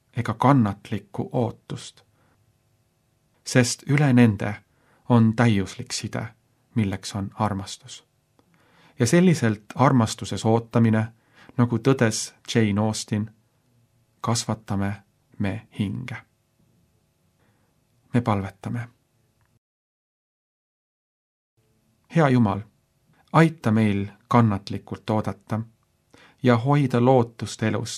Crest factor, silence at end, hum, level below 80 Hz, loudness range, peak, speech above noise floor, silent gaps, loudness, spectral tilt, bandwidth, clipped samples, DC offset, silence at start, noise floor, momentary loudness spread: 22 dB; 0 s; none; -62 dBFS; 10 LU; -2 dBFS; 45 dB; 19.58-21.57 s; -23 LUFS; -6 dB/octave; 13 kHz; under 0.1%; under 0.1%; 0.15 s; -67 dBFS; 15 LU